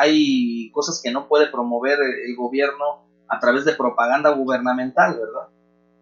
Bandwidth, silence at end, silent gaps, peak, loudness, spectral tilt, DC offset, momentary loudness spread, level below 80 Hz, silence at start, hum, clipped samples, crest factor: 7.4 kHz; 0.55 s; none; -2 dBFS; -20 LUFS; -3.5 dB/octave; under 0.1%; 10 LU; -76 dBFS; 0 s; 60 Hz at -60 dBFS; under 0.1%; 18 dB